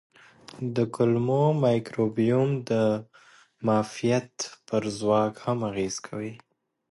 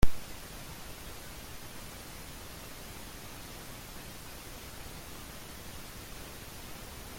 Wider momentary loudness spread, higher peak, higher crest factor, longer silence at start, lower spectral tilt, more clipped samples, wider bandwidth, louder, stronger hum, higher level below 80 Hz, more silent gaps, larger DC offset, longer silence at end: first, 11 LU vs 0 LU; about the same, -10 dBFS vs -8 dBFS; second, 16 dB vs 24 dB; first, 0.55 s vs 0 s; first, -6.5 dB/octave vs -4 dB/octave; neither; second, 11.5 kHz vs 16.5 kHz; first, -26 LUFS vs -45 LUFS; neither; second, -64 dBFS vs -44 dBFS; neither; neither; first, 0.55 s vs 0 s